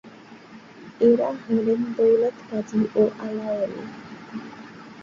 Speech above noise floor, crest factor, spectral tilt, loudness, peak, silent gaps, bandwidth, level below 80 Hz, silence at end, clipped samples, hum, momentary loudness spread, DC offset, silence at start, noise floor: 23 dB; 16 dB; -7.5 dB/octave; -23 LUFS; -8 dBFS; none; 7.2 kHz; -66 dBFS; 0 s; under 0.1%; none; 21 LU; under 0.1%; 0.05 s; -45 dBFS